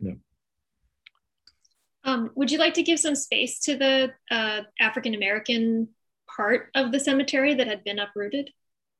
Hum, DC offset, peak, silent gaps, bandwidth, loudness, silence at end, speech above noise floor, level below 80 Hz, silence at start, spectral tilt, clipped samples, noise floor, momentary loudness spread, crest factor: none; under 0.1%; -6 dBFS; none; 12.5 kHz; -24 LUFS; 0.5 s; 56 dB; -66 dBFS; 0 s; -2.5 dB/octave; under 0.1%; -81 dBFS; 10 LU; 20 dB